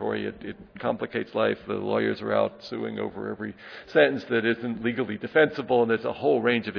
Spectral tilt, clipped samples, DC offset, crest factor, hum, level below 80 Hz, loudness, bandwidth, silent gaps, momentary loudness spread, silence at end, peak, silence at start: -7.5 dB/octave; under 0.1%; under 0.1%; 20 dB; none; -62 dBFS; -26 LUFS; 5.4 kHz; none; 12 LU; 0 s; -6 dBFS; 0 s